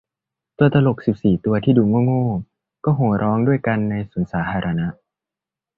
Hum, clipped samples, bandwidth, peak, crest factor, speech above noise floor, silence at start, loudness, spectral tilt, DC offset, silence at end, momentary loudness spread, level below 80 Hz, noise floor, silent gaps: none; under 0.1%; 4.6 kHz; -2 dBFS; 18 dB; 70 dB; 0.6 s; -19 LUFS; -11 dB/octave; under 0.1%; 0.85 s; 9 LU; -46 dBFS; -88 dBFS; none